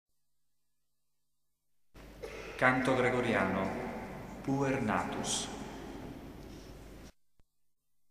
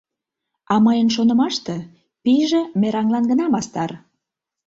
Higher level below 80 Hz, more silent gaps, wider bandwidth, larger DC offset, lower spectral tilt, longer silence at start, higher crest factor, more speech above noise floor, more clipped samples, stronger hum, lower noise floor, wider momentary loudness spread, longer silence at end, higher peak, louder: about the same, -56 dBFS vs -60 dBFS; neither; first, 15.5 kHz vs 7.8 kHz; neither; about the same, -4.5 dB/octave vs -5.5 dB/octave; first, 1.95 s vs 0.7 s; first, 26 dB vs 14 dB; second, 56 dB vs 64 dB; neither; neither; first, -87 dBFS vs -82 dBFS; first, 20 LU vs 10 LU; first, 1 s vs 0.7 s; second, -10 dBFS vs -6 dBFS; second, -33 LUFS vs -19 LUFS